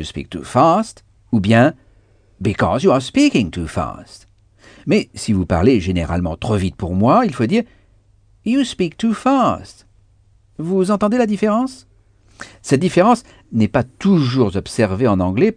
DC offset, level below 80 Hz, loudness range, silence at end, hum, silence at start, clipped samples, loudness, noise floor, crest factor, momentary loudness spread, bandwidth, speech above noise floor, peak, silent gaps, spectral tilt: under 0.1%; -40 dBFS; 3 LU; 0.05 s; none; 0 s; under 0.1%; -17 LUFS; -53 dBFS; 16 dB; 12 LU; 10 kHz; 37 dB; 0 dBFS; none; -6.5 dB/octave